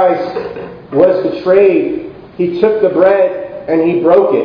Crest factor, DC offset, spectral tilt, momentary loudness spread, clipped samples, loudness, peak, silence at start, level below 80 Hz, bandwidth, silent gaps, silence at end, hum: 12 dB; under 0.1%; -9 dB/octave; 14 LU; 0.2%; -12 LUFS; 0 dBFS; 0 s; -50 dBFS; 5.2 kHz; none; 0 s; none